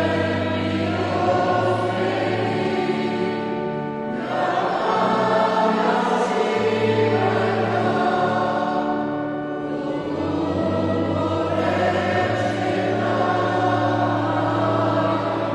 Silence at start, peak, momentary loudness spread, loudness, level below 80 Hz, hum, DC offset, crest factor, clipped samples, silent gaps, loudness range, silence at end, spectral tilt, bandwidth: 0 s; -6 dBFS; 6 LU; -21 LUFS; -56 dBFS; none; under 0.1%; 14 dB; under 0.1%; none; 3 LU; 0 s; -6.5 dB/octave; 11.5 kHz